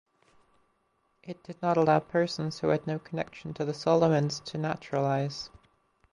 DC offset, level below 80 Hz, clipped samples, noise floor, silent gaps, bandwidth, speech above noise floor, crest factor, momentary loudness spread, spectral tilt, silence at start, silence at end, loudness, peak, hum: under 0.1%; -66 dBFS; under 0.1%; -73 dBFS; none; 11 kHz; 45 dB; 20 dB; 15 LU; -6.5 dB/octave; 1.25 s; 0.65 s; -29 LUFS; -10 dBFS; none